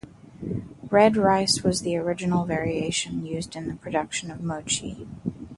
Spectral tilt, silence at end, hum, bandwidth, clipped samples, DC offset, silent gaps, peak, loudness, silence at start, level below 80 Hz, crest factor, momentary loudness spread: -4.5 dB/octave; 0 s; none; 11.5 kHz; under 0.1%; under 0.1%; none; -4 dBFS; -25 LUFS; 0.05 s; -52 dBFS; 20 dB; 15 LU